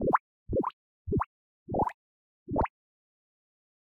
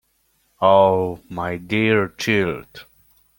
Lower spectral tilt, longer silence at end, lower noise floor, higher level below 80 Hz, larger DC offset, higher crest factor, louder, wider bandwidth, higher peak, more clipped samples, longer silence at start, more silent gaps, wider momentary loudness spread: first, -10 dB/octave vs -6 dB/octave; first, 1.15 s vs 0.55 s; first, under -90 dBFS vs -65 dBFS; first, -48 dBFS vs -54 dBFS; neither; about the same, 22 dB vs 20 dB; second, -33 LUFS vs -19 LUFS; second, 9.8 kHz vs 17 kHz; second, -12 dBFS vs -2 dBFS; neither; second, 0 s vs 0.6 s; first, 0.20-0.46 s, 0.73-1.05 s, 1.26-1.66 s, 1.94-2.46 s vs none; second, 6 LU vs 13 LU